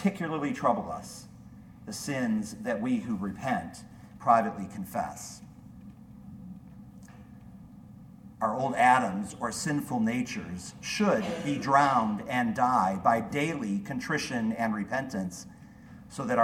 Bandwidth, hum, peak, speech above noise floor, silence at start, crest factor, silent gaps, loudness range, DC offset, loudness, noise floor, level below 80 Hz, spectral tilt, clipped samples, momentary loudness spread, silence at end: 16.5 kHz; none; -10 dBFS; 21 dB; 0 s; 20 dB; none; 11 LU; under 0.1%; -29 LUFS; -49 dBFS; -60 dBFS; -5 dB/octave; under 0.1%; 25 LU; 0 s